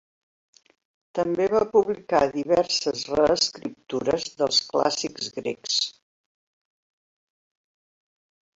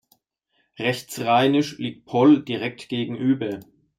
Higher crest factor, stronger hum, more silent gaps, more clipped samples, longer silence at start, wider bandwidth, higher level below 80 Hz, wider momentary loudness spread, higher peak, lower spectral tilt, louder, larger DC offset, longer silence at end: about the same, 20 dB vs 18 dB; neither; neither; neither; first, 1.15 s vs 0.8 s; second, 8.2 kHz vs 15.5 kHz; first, -58 dBFS vs -66 dBFS; second, 9 LU vs 12 LU; about the same, -6 dBFS vs -4 dBFS; second, -3 dB/octave vs -6 dB/octave; about the same, -24 LUFS vs -22 LUFS; neither; first, 2.65 s vs 0.35 s